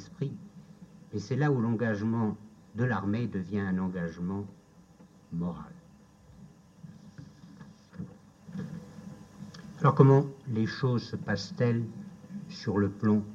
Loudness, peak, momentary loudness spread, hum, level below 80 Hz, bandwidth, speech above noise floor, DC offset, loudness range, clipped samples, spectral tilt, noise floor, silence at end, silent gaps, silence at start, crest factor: -30 LUFS; -6 dBFS; 22 LU; none; -64 dBFS; 7.4 kHz; 28 dB; under 0.1%; 18 LU; under 0.1%; -8 dB/octave; -57 dBFS; 0 s; none; 0 s; 24 dB